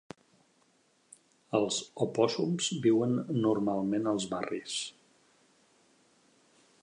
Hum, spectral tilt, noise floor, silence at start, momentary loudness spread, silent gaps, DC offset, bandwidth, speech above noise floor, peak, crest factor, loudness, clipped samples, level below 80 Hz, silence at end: none; -5 dB/octave; -69 dBFS; 1.5 s; 9 LU; none; under 0.1%; 11 kHz; 39 dB; -12 dBFS; 20 dB; -31 LUFS; under 0.1%; -74 dBFS; 1.95 s